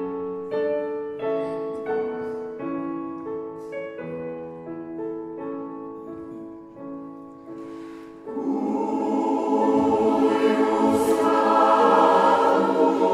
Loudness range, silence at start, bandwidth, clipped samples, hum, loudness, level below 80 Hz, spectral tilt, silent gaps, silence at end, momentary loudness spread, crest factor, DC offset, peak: 17 LU; 0 s; 14.5 kHz; under 0.1%; none; -23 LUFS; -64 dBFS; -6 dB/octave; none; 0 s; 20 LU; 18 dB; under 0.1%; -6 dBFS